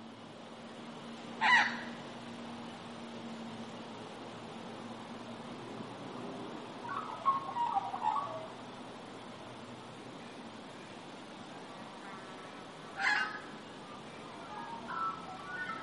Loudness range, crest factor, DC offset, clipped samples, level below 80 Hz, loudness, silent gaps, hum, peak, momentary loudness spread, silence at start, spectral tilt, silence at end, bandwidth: 13 LU; 24 dB; under 0.1%; under 0.1%; -78 dBFS; -39 LUFS; none; none; -14 dBFS; 15 LU; 0 s; -3.5 dB/octave; 0 s; 11.5 kHz